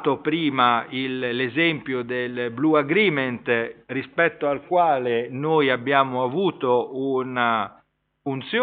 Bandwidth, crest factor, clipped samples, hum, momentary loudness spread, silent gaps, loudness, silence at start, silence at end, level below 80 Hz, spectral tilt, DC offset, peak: 4.7 kHz; 18 dB; under 0.1%; none; 8 LU; none; -22 LUFS; 0 s; 0 s; -68 dBFS; -3.5 dB/octave; under 0.1%; -4 dBFS